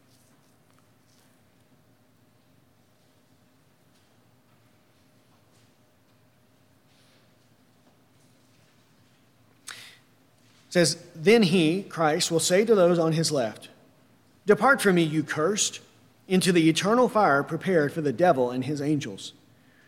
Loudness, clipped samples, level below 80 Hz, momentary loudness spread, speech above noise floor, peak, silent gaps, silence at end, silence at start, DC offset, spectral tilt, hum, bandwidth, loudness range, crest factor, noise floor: -23 LUFS; under 0.1%; -74 dBFS; 18 LU; 40 dB; -6 dBFS; none; 0.55 s; 9.7 s; under 0.1%; -4.5 dB/octave; none; 16.5 kHz; 3 LU; 20 dB; -62 dBFS